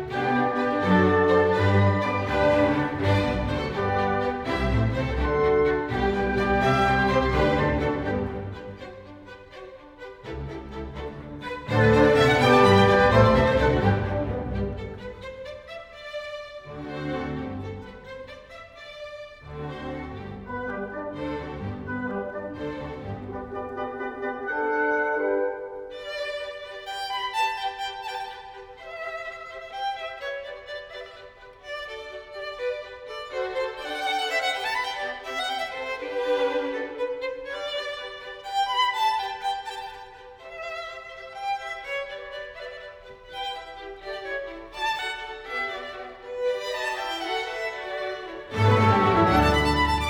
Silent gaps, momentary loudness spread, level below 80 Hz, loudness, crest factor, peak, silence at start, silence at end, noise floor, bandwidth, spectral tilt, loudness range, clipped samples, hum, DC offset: none; 20 LU; -40 dBFS; -25 LUFS; 22 dB; -4 dBFS; 0 s; 0 s; -46 dBFS; 18 kHz; -6 dB/octave; 14 LU; under 0.1%; none; under 0.1%